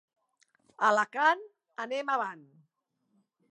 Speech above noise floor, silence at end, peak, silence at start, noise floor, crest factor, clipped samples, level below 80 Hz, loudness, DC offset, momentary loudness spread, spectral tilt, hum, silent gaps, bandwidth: 49 dB; 1.1 s; -12 dBFS; 0.8 s; -78 dBFS; 22 dB; under 0.1%; under -90 dBFS; -29 LUFS; under 0.1%; 13 LU; -3 dB/octave; none; none; 11 kHz